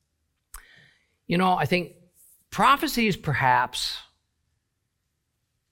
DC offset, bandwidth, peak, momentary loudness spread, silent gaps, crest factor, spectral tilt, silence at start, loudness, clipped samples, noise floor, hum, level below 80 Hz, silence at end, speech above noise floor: under 0.1%; 17 kHz; -6 dBFS; 12 LU; none; 20 dB; -4.5 dB/octave; 0.55 s; -23 LUFS; under 0.1%; -77 dBFS; none; -54 dBFS; 1.7 s; 54 dB